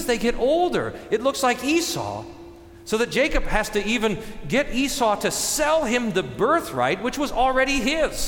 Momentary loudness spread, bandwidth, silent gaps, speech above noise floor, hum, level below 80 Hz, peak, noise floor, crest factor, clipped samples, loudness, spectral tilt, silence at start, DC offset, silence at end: 6 LU; 19 kHz; none; 21 dB; none; -36 dBFS; -8 dBFS; -43 dBFS; 16 dB; under 0.1%; -22 LUFS; -3.5 dB/octave; 0 s; under 0.1%; 0 s